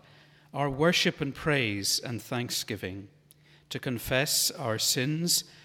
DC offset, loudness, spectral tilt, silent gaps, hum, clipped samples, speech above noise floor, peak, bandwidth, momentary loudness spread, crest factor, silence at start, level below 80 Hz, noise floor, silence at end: under 0.1%; -28 LUFS; -3 dB/octave; none; none; under 0.1%; 30 dB; -10 dBFS; 17.5 kHz; 12 LU; 20 dB; 0.55 s; -58 dBFS; -59 dBFS; 0.05 s